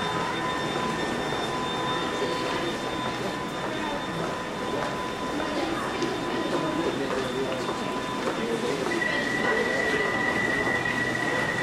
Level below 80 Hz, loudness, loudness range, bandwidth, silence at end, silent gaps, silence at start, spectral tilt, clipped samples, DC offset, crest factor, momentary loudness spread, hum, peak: -52 dBFS; -27 LUFS; 4 LU; 16 kHz; 0 s; none; 0 s; -4 dB/octave; under 0.1%; under 0.1%; 16 dB; 6 LU; none; -12 dBFS